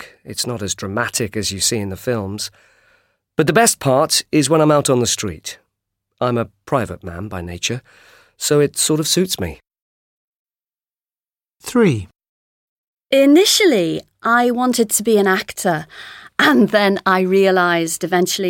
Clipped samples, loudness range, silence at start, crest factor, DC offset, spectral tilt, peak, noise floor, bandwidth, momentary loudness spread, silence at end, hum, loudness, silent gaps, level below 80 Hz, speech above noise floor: under 0.1%; 8 LU; 0 s; 18 dB; under 0.1%; -3.5 dB/octave; 0 dBFS; under -90 dBFS; 17 kHz; 14 LU; 0 s; none; -16 LUFS; 9.82-10.46 s, 12.29-12.97 s; -50 dBFS; over 73 dB